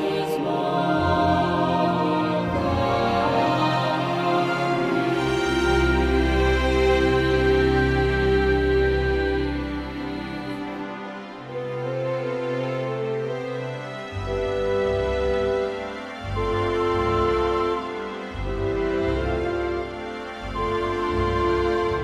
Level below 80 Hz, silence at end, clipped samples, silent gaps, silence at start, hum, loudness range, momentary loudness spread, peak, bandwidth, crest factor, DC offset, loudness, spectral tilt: -34 dBFS; 0 s; under 0.1%; none; 0 s; none; 8 LU; 11 LU; -8 dBFS; 13.5 kHz; 16 dB; under 0.1%; -23 LUFS; -6.5 dB/octave